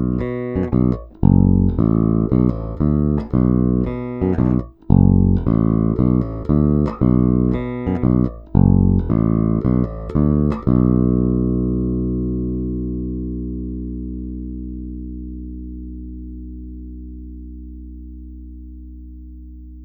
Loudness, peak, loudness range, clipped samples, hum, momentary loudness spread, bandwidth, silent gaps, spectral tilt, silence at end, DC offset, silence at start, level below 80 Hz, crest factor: -18 LUFS; 0 dBFS; 17 LU; under 0.1%; 60 Hz at -40 dBFS; 21 LU; 4 kHz; none; -13 dB/octave; 0 s; under 0.1%; 0 s; -28 dBFS; 18 dB